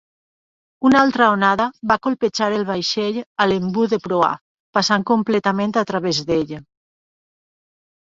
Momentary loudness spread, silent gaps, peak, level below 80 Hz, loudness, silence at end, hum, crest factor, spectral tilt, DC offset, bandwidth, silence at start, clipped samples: 7 LU; 3.26-3.35 s, 4.41-4.73 s; -2 dBFS; -56 dBFS; -18 LUFS; 1.4 s; none; 18 dB; -5 dB/octave; under 0.1%; 7.8 kHz; 0.8 s; under 0.1%